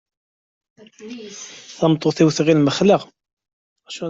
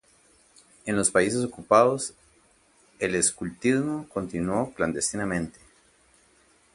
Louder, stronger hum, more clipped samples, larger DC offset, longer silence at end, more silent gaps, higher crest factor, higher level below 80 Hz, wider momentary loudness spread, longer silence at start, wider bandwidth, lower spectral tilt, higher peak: first, -17 LUFS vs -25 LUFS; neither; neither; neither; second, 0 s vs 1.25 s; first, 3.33-3.37 s, 3.53-3.76 s vs none; second, 18 dB vs 24 dB; about the same, -60 dBFS vs -56 dBFS; first, 20 LU vs 11 LU; first, 1 s vs 0.85 s; second, 8 kHz vs 11.5 kHz; first, -6 dB/octave vs -4 dB/octave; about the same, -2 dBFS vs -4 dBFS